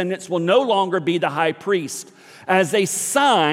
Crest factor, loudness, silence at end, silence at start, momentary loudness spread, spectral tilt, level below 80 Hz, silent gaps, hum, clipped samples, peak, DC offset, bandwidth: 16 dB; -19 LUFS; 0 s; 0 s; 7 LU; -3.5 dB/octave; -74 dBFS; none; none; under 0.1%; -4 dBFS; under 0.1%; 16.5 kHz